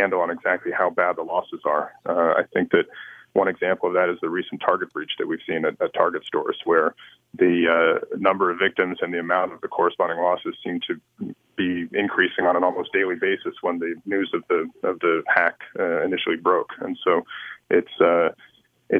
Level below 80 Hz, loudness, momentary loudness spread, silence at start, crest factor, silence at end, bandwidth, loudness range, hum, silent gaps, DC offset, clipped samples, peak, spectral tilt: -70 dBFS; -23 LUFS; 8 LU; 0 s; 22 dB; 0 s; 4.7 kHz; 3 LU; none; none; under 0.1%; under 0.1%; 0 dBFS; -7.5 dB/octave